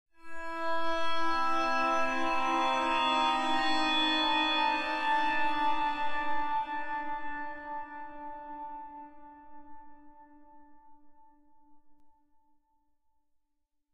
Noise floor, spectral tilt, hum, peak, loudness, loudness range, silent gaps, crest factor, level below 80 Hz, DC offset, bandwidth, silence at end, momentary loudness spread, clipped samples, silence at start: -77 dBFS; -2.5 dB/octave; none; -16 dBFS; -30 LUFS; 18 LU; none; 14 dB; -58 dBFS; under 0.1%; 12.5 kHz; 1.85 s; 17 LU; under 0.1%; 0.2 s